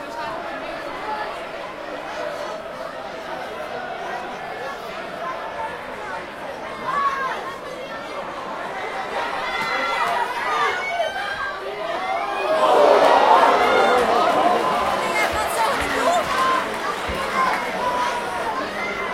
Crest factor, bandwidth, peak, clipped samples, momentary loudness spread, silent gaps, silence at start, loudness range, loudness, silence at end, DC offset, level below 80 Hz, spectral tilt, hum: 22 dB; 16.5 kHz; 0 dBFS; under 0.1%; 15 LU; none; 0 s; 13 LU; -22 LUFS; 0 s; under 0.1%; -50 dBFS; -3 dB/octave; none